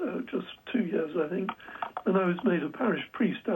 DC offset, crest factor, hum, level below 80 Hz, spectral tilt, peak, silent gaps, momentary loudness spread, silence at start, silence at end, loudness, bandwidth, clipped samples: under 0.1%; 16 dB; none; -72 dBFS; -9 dB/octave; -14 dBFS; none; 9 LU; 0 s; 0 s; -30 LUFS; 16 kHz; under 0.1%